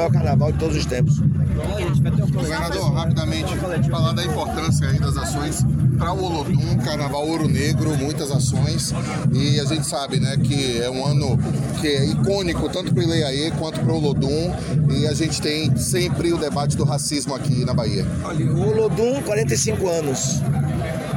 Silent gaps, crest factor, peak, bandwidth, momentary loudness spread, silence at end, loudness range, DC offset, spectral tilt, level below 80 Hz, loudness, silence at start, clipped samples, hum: none; 12 dB; -8 dBFS; 16.5 kHz; 4 LU; 0 s; 1 LU; under 0.1%; -5.5 dB/octave; -36 dBFS; -20 LUFS; 0 s; under 0.1%; none